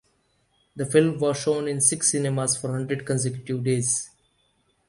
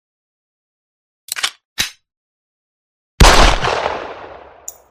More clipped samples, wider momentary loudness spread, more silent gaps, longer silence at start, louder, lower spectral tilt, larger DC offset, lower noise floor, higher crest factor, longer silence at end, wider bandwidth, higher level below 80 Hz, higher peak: second, under 0.1% vs 0.2%; second, 8 LU vs 24 LU; second, none vs 1.65-1.76 s, 2.17-3.18 s; second, 0.75 s vs 1.3 s; second, -23 LUFS vs -15 LUFS; first, -4.5 dB/octave vs -3 dB/octave; neither; first, -67 dBFS vs -37 dBFS; about the same, 20 dB vs 18 dB; first, 0.8 s vs 0.6 s; second, 11.5 kHz vs 16 kHz; second, -62 dBFS vs -22 dBFS; second, -4 dBFS vs 0 dBFS